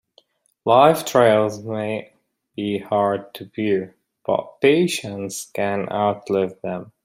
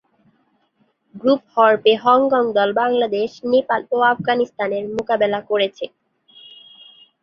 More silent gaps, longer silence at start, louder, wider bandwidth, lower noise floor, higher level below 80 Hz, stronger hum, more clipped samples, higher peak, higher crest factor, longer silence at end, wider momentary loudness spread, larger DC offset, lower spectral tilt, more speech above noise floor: neither; second, 0.65 s vs 1.15 s; second, -21 LUFS vs -18 LUFS; first, 16 kHz vs 7 kHz; second, -59 dBFS vs -64 dBFS; about the same, -66 dBFS vs -64 dBFS; neither; neither; about the same, 0 dBFS vs -2 dBFS; about the same, 20 dB vs 18 dB; second, 0.15 s vs 1.35 s; first, 15 LU vs 9 LU; neither; about the same, -5 dB/octave vs -6 dB/octave; second, 39 dB vs 46 dB